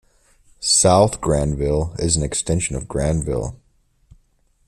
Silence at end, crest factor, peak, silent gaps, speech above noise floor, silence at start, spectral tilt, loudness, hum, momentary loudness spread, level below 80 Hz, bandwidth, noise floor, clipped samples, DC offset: 1.15 s; 18 dB; -2 dBFS; none; 42 dB; 0.6 s; -4 dB/octave; -19 LUFS; none; 11 LU; -34 dBFS; 13.5 kHz; -60 dBFS; under 0.1%; under 0.1%